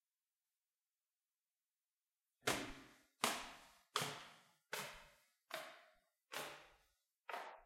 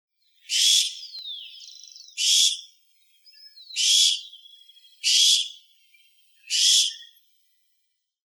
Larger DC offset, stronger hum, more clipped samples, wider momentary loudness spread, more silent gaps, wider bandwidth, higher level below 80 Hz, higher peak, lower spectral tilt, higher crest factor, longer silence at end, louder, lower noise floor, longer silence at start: neither; neither; neither; about the same, 19 LU vs 21 LU; neither; second, 16 kHz vs over 20 kHz; first, -76 dBFS vs under -90 dBFS; second, -16 dBFS vs -6 dBFS; first, -1.5 dB/octave vs 10.5 dB/octave; first, 34 dB vs 20 dB; second, 0 s vs 1.25 s; second, -46 LUFS vs -19 LUFS; first, under -90 dBFS vs -75 dBFS; first, 2.45 s vs 0.5 s